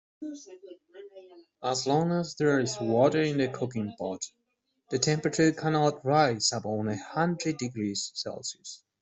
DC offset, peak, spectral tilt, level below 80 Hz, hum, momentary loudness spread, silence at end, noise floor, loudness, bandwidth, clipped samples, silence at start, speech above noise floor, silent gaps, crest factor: under 0.1%; -8 dBFS; -4.5 dB/octave; -68 dBFS; none; 17 LU; 0.25 s; -77 dBFS; -28 LUFS; 8.2 kHz; under 0.1%; 0.2 s; 48 dB; none; 22 dB